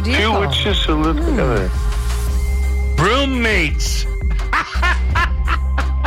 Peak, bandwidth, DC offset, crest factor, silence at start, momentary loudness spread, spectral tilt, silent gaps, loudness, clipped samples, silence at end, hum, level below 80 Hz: -6 dBFS; 15 kHz; under 0.1%; 10 dB; 0 s; 6 LU; -5 dB/octave; none; -17 LUFS; under 0.1%; 0 s; none; -18 dBFS